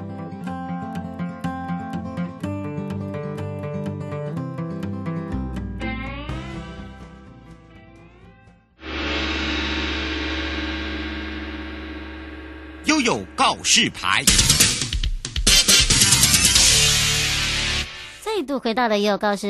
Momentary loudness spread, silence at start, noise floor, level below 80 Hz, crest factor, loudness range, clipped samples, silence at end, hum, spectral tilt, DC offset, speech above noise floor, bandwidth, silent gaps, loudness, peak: 19 LU; 0 s; -51 dBFS; -34 dBFS; 22 dB; 16 LU; under 0.1%; 0 s; none; -2 dB/octave; under 0.1%; 32 dB; 12.5 kHz; none; -19 LUFS; 0 dBFS